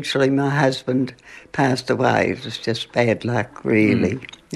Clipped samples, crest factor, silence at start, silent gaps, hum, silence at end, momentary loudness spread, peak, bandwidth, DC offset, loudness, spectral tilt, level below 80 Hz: under 0.1%; 16 dB; 0 s; none; none; 0 s; 7 LU; -4 dBFS; 12.5 kHz; under 0.1%; -20 LUFS; -6 dB/octave; -58 dBFS